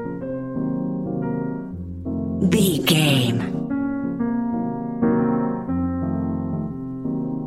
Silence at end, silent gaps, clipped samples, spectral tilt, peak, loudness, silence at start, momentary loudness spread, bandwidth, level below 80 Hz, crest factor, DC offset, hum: 0 s; none; under 0.1%; -5.5 dB/octave; -4 dBFS; -23 LUFS; 0 s; 11 LU; 16.5 kHz; -46 dBFS; 20 dB; 0.2%; none